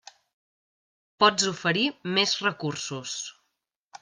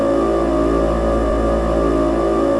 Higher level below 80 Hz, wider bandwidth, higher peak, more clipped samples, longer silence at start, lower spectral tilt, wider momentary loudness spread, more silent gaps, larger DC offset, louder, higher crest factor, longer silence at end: second, -72 dBFS vs -24 dBFS; about the same, 10.5 kHz vs 11 kHz; about the same, -6 dBFS vs -4 dBFS; neither; first, 1.2 s vs 0 s; second, -2.5 dB/octave vs -7.5 dB/octave; first, 12 LU vs 1 LU; neither; neither; second, -25 LUFS vs -17 LUFS; first, 22 dB vs 12 dB; first, 0.7 s vs 0 s